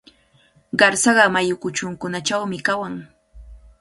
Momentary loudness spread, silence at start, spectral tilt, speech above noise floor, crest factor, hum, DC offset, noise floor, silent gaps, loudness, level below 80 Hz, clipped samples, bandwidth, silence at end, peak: 12 LU; 0.75 s; -3 dB/octave; 38 dB; 22 dB; none; under 0.1%; -57 dBFS; none; -19 LUFS; -50 dBFS; under 0.1%; 11.5 kHz; 0.25 s; 0 dBFS